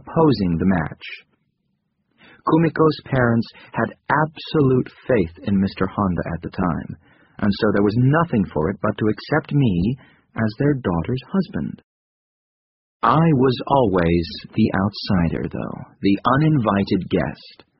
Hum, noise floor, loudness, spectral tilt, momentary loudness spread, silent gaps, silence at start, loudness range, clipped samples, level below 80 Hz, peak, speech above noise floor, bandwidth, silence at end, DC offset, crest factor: none; -71 dBFS; -20 LUFS; -6.5 dB/octave; 11 LU; 11.84-13.00 s; 0.05 s; 3 LU; under 0.1%; -44 dBFS; -2 dBFS; 52 dB; 5.8 kHz; 0.3 s; under 0.1%; 18 dB